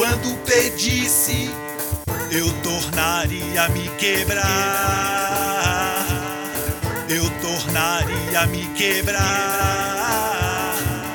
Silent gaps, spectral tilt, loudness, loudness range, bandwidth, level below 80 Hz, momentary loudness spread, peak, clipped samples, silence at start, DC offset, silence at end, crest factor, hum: none; -3 dB/octave; -20 LUFS; 2 LU; 19.5 kHz; -36 dBFS; 7 LU; -4 dBFS; under 0.1%; 0 s; under 0.1%; 0 s; 18 dB; none